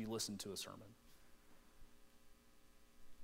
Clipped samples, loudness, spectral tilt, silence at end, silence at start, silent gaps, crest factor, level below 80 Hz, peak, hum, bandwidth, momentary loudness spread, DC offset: under 0.1%; -47 LUFS; -3 dB/octave; 0 s; 0 s; none; 20 dB; -70 dBFS; -32 dBFS; none; 16 kHz; 25 LU; under 0.1%